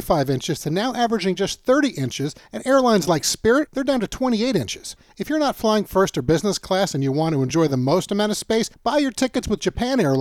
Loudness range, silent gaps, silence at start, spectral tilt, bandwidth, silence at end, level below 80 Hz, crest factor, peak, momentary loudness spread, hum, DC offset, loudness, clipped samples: 1 LU; none; 0 s; -5 dB/octave; 17 kHz; 0 s; -46 dBFS; 16 dB; -4 dBFS; 6 LU; none; under 0.1%; -21 LUFS; under 0.1%